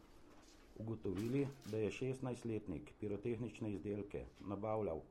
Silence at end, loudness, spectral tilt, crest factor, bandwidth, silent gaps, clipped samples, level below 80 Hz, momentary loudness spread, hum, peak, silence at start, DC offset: 0 s; -44 LUFS; -7.5 dB/octave; 16 dB; 16 kHz; none; under 0.1%; -64 dBFS; 10 LU; none; -28 dBFS; 0 s; under 0.1%